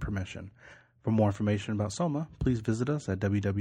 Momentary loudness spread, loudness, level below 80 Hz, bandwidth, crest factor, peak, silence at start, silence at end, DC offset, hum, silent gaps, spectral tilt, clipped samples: 11 LU; -31 LUFS; -48 dBFS; 10 kHz; 16 dB; -14 dBFS; 0 s; 0 s; under 0.1%; none; none; -7 dB/octave; under 0.1%